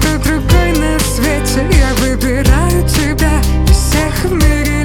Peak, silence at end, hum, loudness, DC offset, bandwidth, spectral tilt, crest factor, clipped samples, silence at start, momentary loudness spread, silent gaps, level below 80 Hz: 0 dBFS; 0 s; none; -12 LUFS; under 0.1%; 18 kHz; -5 dB/octave; 10 dB; under 0.1%; 0 s; 3 LU; none; -14 dBFS